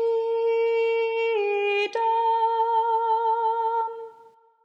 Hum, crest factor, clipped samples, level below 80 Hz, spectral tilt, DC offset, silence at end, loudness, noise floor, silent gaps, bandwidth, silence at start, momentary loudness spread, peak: none; 10 dB; under 0.1%; under -90 dBFS; -2 dB/octave; under 0.1%; 0.55 s; -23 LUFS; -54 dBFS; none; 7 kHz; 0 s; 4 LU; -14 dBFS